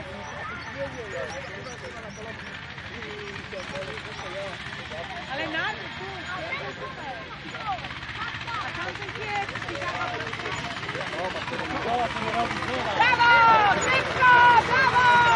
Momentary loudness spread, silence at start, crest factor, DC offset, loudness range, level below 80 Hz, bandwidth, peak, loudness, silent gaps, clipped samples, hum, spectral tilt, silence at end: 19 LU; 0 s; 20 dB; under 0.1%; 15 LU; -52 dBFS; 11 kHz; -6 dBFS; -24 LUFS; none; under 0.1%; none; -3.5 dB/octave; 0 s